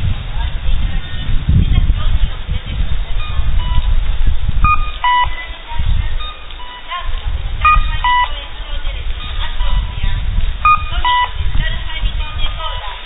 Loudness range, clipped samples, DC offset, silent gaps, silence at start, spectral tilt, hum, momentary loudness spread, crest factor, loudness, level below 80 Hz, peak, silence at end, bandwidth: 2 LU; under 0.1%; under 0.1%; none; 0 s; -9.5 dB/octave; none; 11 LU; 14 dB; -18 LUFS; -18 dBFS; 0 dBFS; 0 s; 4 kHz